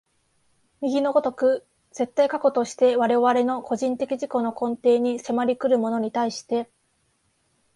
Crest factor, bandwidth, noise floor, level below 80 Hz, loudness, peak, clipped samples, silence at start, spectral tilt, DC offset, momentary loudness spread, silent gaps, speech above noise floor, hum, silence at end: 16 dB; 11.5 kHz; -68 dBFS; -70 dBFS; -23 LUFS; -8 dBFS; under 0.1%; 0.8 s; -5 dB/octave; under 0.1%; 9 LU; none; 46 dB; none; 1.1 s